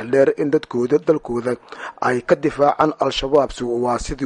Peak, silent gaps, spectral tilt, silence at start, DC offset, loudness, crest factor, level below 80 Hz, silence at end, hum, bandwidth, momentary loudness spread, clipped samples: -2 dBFS; none; -5.5 dB/octave; 0 s; under 0.1%; -19 LUFS; 16 dB; -42 dBFS; 0 s; none; 11 kHz; 7 LU; under 0.1%